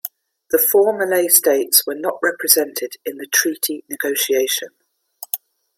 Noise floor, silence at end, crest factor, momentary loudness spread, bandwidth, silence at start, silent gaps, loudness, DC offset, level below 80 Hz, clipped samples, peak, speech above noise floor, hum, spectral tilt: -41 dBFS; 0.4 s; 20 dB; 14 LU; 16.5 kHz; 0.05 s; none; -17 LUFS; under 0.1%; -68 dBFS; under 0.1%; 0 dBFS; 23 dB; none; -0.5 dB/octave